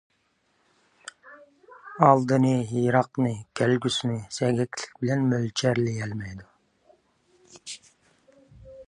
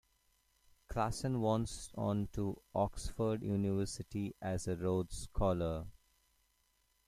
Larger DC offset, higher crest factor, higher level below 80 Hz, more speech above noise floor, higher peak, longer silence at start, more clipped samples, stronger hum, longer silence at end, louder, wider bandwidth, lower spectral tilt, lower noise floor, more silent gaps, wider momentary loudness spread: neither; first, 24 dB vs 18 dB; second, -62 dBFS vs -52 dBFS; first, 46 dB vs 40 dB; first, -2 dBFS vs -20 dBFS; first, 1.25 s vs 0.9 s; neither; neither; second, 0.05 s vs 1.15 s; first, -24 LUFS vs -38 LUFS; second, 11 kHz vs 15 kHz; about the same, -6 dB/octave vs -6.5 dB/octave; second, -70 dBFS vs -76 dBFS; neither; first, 24 LU vs 7 LU